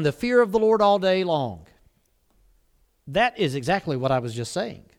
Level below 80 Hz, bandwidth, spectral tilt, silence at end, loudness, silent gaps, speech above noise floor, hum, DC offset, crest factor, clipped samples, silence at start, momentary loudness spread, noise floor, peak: -54 dBFS; 15 kHz; -5.5 dB/octave; 0.2 s; -23 LUFS; none; 43 dB; none; under 0.1%; 18 dB; under 0.1%; 0 s; 10 LU; -65 dBFS; -6 dBFS